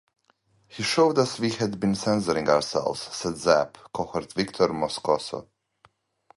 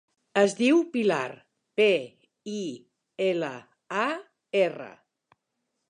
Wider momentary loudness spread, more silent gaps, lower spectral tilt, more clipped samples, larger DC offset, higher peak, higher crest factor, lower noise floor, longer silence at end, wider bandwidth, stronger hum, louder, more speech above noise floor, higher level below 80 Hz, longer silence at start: second, 9 LU vs 22 LU; neither; about the same, -4.5 dB/octave vs -4.5 dB/octave; neither; neither; about the same, -6 dBFS vs -8 dBFS; about the same, 20 dB vs 20 dB; second, -66 dBFS vs -80 dBFS; about the same, 0.95 s vs 1 s; about the same, 11.5 kHz vs 10.5 kHz; neither; about the same, -25 LUFS vs -27 LUFS; second, 41 dB vs 55 dB; first, -58 dBFS vs -82 dBFS; first, 0.7 s vs 0.35 s